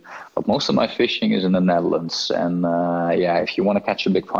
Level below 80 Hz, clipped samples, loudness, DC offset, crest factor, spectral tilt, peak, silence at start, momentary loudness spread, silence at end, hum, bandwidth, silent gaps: -56 dBFS; under 0.1%; -20 LUFS; under 0.1%; 14 dB; -6 dB/octave; -6 dBFS; 0.05 s; 4 LU; 0 s; none; 7.4 kHz; none